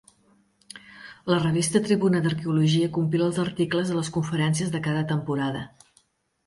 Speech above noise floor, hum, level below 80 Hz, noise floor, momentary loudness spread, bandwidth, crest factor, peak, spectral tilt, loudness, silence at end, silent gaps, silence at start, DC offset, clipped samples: 41 dB; none; -60 dBFS; -65 dBFS; 19 LU; 11.5 kHz; 18 dB; -8 dBFS; -6 dB/octave; -24 LUFS; 0.8 s; none; 0.75 s; under 0.1%; under 0.1%